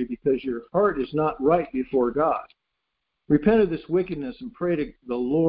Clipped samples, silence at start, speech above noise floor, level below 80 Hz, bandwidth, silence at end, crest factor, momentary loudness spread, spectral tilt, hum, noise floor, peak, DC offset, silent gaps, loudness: under 0.1%; 0 s; 56 dB; -50 dBFS; 5 kHz; 0 s; 18 dB; 10 LU; -12 dB/octave; none; -80 dBFS; -6 dBFS; under 0.1%; none; -24 LUFS